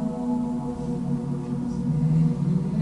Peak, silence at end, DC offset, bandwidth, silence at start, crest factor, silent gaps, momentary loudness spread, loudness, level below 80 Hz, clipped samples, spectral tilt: -12 dBFS; 0 s; under 0.1%; 10.5 kHz; 0 s; 12 dB; none; 7 LU; -26 LUFS; -46 dBFS; under 0.1%; -9.5 dB/octave